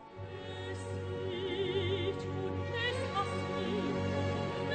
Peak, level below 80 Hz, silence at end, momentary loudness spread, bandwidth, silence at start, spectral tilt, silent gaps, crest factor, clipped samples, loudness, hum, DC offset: -22 dBFS; -62 dBFS; 0 s; 8 LU; 9.2 kHz; 0 s; -6 dB/octave; none; 14 dB; under 0.1%; -36 LUFS; none; under 0.1%